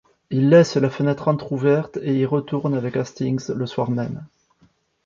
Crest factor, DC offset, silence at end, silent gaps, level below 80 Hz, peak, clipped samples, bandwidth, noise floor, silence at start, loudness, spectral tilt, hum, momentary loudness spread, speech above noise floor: 18 dB; under 0.1%; 0.8 s; none; -60 dBFS; -2 dBFS; under 0.1%; 7.6 kHz; -60 dBFS; 0.3 s; -21 LUFS; -7.5 dB/octave; none; 11 LU; 40 dB